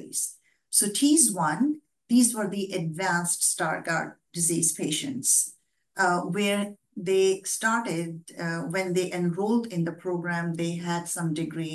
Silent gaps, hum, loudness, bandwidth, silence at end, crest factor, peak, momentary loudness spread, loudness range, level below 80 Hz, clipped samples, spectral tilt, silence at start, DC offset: none; none; -26 LUFS; 13 kHz; 0 s; 20 dB; -6 dBFS; 10 LU; 5 LU; -76 dBFS; under 0.1%; -3.5 dB/octave; 0 s; under 0.1%